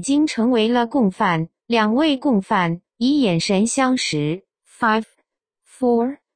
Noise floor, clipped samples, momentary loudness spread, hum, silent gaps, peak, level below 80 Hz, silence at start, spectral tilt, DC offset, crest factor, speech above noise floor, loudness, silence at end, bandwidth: -71 dBFS; under 0.1%; 6 LU; none; none; -4 dBFS; -58 dBFS; 0 s; -5 dB/octave; under 0.1%; 16 dB; 53 dB; -19 LUFS; 0.2 s; 10 kHz